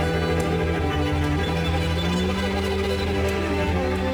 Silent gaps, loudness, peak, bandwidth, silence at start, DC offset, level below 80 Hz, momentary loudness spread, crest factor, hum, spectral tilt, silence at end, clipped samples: none; -23 LUFS; -12 dBFS; 20 kHz; 0 s; under 0.1%; -32 dBFS; 1 LU; 10 dB; none; -6 dB/octave; 0 s; under 0.1%